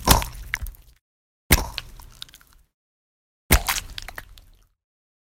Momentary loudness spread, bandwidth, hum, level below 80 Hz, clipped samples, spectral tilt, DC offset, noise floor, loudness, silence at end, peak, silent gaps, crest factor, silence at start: 21 LU; 16.5 kHz; none; -32 dBFS; under 0.1%; -3 dB/octave; under 0.1%; -52 dBFS; -23 LUFS; 1.05 s; 0 dBFS; 1.01-1.50 s, 2.74-3.50 s; 26 dB; 0 s